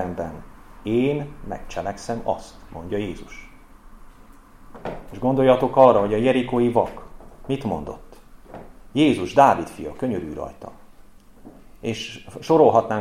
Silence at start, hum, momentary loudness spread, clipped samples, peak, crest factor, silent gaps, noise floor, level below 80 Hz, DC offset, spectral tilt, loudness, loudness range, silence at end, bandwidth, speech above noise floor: 0 s; none; 26 LU; under 0.1%; -2 dBFS; 22 dB; none; -46 dBFS; -44 dBFS; under 0.1%; -6.5 dB/octave; -21 LUFS; 12 LU; 0 s; 14.5 kHz; 25 dB